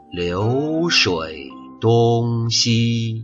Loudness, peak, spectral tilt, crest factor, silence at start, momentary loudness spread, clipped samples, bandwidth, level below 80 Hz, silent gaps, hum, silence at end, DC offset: -18 LUFS; -4 dBFS; -4.5 dB/octave; 16 dB; 0.1 s; 11 LU; under 0.1%; 7.8 kHz; -50 dBFS; none; none; 0 s; under 0.1%